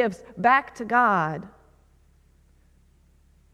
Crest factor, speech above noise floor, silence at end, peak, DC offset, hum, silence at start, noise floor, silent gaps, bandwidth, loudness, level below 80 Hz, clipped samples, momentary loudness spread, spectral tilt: 20 dB; 36 dB; 2.05 s; -6 dBFS; under 0.1%; none; 0 s; -59 dBFS; none; 11.5 kHz; -22 LUFS; -60 dBFS; under 0.1%; 9 LU; -6 dB/octave